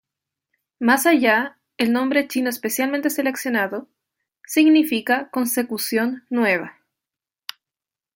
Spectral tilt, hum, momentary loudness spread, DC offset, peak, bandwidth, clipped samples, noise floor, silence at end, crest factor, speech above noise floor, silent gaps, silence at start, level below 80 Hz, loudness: -3 dB/octave; none; 15 LU; under 0.1%; -2 dBFS; 17 kHz; under 0.1%; -90 dBFS; 1.45 s; 18 dB; 70 dB; none; 0.8 s; -72 dBFS; -20 LUFS